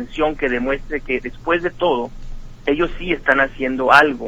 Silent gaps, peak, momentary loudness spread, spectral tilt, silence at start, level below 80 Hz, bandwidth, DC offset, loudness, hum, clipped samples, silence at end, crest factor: none; 0 dBFS; 11 LU; -5.5 dB/octave; 0 s; -34 dBFS; 15.5 kHz; under 0.1%; -18 LUFS; none; under 0.1%; 0 s; 18 dB